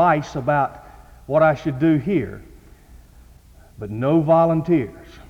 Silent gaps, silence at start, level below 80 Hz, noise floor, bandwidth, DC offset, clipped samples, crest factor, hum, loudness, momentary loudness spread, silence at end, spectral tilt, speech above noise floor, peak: none; 0 s; -46 dBFS; -47 dBFS; 7.8 kHz; under 0.1%; under 0.1%; 16 dB; none; -19 LUFS; 16 LU; 0.1 s; -8.5 dB/octave; 28 dB; -4 dBFS